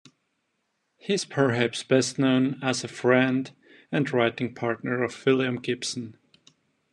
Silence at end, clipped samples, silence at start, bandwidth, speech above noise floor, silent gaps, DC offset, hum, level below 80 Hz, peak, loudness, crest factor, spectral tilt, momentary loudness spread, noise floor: 0.8 s; under 0.1%; 1.05 s; 11 kHz; 51 dB; none; under 0.1%; none; -72 dBFS; -6 dBFS; -25 LUFS; 20 dB; -5 dB/octave; 9 LU; -76 dBFS